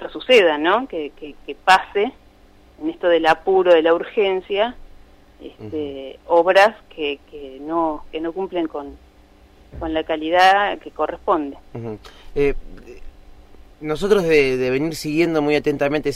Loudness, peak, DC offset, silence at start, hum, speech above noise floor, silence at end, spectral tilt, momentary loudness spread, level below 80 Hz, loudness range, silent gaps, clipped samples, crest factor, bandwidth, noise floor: -19 LUFS; -4 dBFS; under 0.1%; 0 s; none; 30 dB; 0 s; -5 dB/octave; 18 LU; -42 dBFS; 6 LU; none; under 0.1%; 16 dB; 15.5 kHz; -49 dBFS